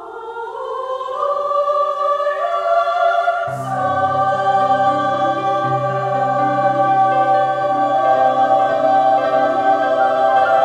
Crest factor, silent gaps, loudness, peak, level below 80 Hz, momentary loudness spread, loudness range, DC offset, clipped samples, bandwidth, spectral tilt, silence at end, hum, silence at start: 12 dB; none; -16 LUFS; -4 dBFS; -64 dBFS; 7 LU; 3 LU; under 0.1%; under 0.1%; 9.4 kHz; -6 dB/octave; 0 s; none; 0 s